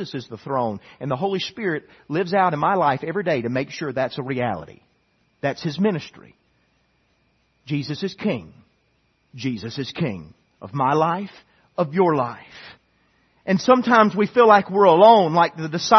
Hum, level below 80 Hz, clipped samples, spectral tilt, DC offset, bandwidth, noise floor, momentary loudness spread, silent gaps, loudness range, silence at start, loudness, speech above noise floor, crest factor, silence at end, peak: none; -64 dBFS; under 0.1%; -6 dB/octave; under 0.1%; 6.4 kHz; -65 dBFS; 16 LU; none; 13 LU; 0 s; -20 LUFS; 45 dB; 20 dB; 0 s; 0 dBFS